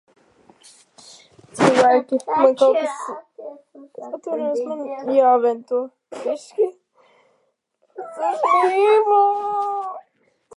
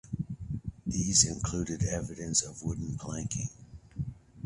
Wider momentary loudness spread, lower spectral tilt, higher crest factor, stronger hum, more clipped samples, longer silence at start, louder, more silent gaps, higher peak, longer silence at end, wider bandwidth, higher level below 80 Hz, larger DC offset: first, 20 LU vs 16 LU; first, -5 dB/octave vs -3.5 dB/octave; about the same, 20 dB vs 24 dB; neither; neither; first, 1.55 s vs 0.05 s; first, -19 LUFS vs -31 LUFS; neither; first, -2 dBFS vs -10 dBFS; first, 0.6 s vs 0 s; about the same, 11.5 kHz vs 11.5 kHz; second, -74 dBFS vs -48 dBFS; neither